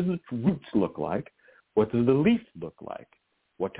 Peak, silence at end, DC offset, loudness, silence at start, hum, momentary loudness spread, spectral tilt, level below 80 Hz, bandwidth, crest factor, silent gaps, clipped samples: -10 dBFS; 0 s; under 0.1%; -27 LUFS; 0 s; none; 19 LU; -11.5 dB/octave; -58 dBFS; 4 kHz; 18 dB; none; under 0.1%